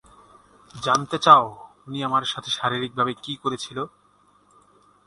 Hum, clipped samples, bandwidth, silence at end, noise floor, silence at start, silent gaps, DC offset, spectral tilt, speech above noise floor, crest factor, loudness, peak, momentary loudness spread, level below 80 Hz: 50 Hz at -55 dBFS; under 0.1%; 11.5 kHz; 1.2 s; -60 dBFS; 0.75 s; none; under 0.1%; -4 dB/octave; 38 dB; 24 dB; -22 LUFS; 0 dBFS; 17 LU; -64 dBFS